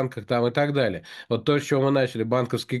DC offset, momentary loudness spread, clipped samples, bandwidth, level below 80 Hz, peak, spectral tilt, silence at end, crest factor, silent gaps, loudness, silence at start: under 0.1%; 5 LU; under 0.1%; 12.5 kHz; -64 dBFS; -8 dBFS; -6.5 dB/octave; 0 s; 16 dB; none; -24 LUFS; 0 s